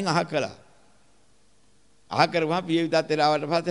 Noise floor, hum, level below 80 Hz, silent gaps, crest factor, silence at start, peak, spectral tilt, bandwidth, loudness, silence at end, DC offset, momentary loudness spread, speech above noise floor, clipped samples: -63 dBFS; none; -68 dBFS; none; 22 dB; 0 s; -4 dBFS; -5 dB/octave; 11.5 kHz; -24 LUFS; 0 s; 0.1%; 7 LU; 40 dB; under 0.1%